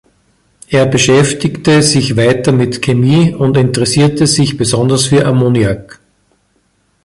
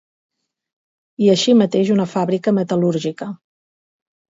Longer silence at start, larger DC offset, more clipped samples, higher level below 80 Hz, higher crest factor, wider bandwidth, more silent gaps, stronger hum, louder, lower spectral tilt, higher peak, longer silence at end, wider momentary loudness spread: second, 0.7 s vs 1.2 s; neither; neither; first, -40 dBFS vs -66 dBFS; second, 12 dB vs 18 dB; first, 11.5 kHz vs 7.8 kHz; neither; neither; first, -11 LUFS vs -17 LUFS; about the same, -5 dB/octave vs -6 dB/octave; about the same, 0 dBFS vs -2 dBFS; first, 1.2 s vs 1 s; second, 5 LU vs 15 LU